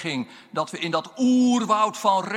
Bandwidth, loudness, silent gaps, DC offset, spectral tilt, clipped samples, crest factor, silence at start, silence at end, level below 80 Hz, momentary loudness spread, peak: 12.5 kHz; -23 LUFS; none; under 0.1%; -4.5 dB/octave; under 0.1%; 16 dB; 0 s; 0 s; -76 dBFS; 10 LU; -8 dBFS